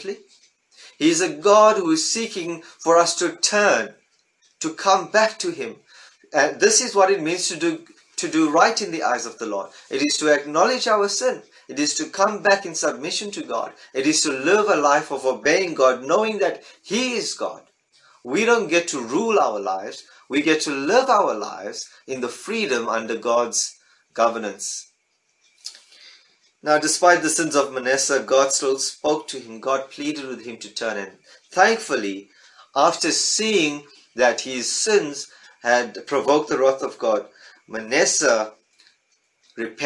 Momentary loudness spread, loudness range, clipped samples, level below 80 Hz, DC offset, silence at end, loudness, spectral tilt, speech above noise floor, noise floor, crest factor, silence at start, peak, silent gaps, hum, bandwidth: 15 LU; 5 LU; under 0.1%; -74 dBFS; under 0.1%; 0 s; -20 LUFS; -2 dB/octave; 47 dB; -68 dBFS; 20 dB; 0 s; -2 dBFS; none; none; 11.5 kHz